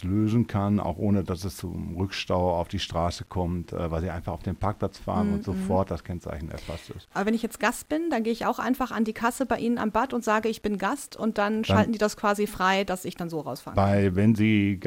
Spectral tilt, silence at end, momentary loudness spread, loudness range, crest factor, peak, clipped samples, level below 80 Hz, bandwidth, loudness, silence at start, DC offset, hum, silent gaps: -6 dB/octave; 0 s; 10 LU; 4 LU; 20 dB; -8 dBFS; under 0.1%; -46 dBFS; 16.5 kHz; -27 LUFS; 0 s; under 0.1%; none; none